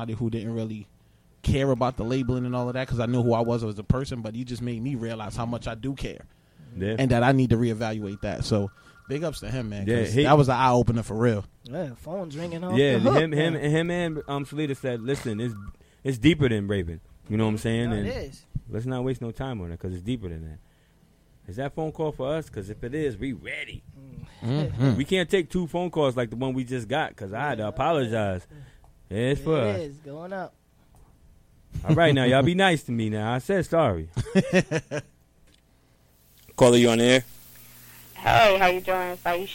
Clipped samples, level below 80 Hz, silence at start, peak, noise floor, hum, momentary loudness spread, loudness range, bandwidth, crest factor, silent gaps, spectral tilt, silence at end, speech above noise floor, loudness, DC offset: under 0.1%; -46 dBFS; 0 s; -4 dBFS; -60 dBFS; none; 16 LU; 9 LU; 17 kHz; 20 dB; none; -6 dB/octave; 0 s; 36 dB; -25 LUFS; under 0.1%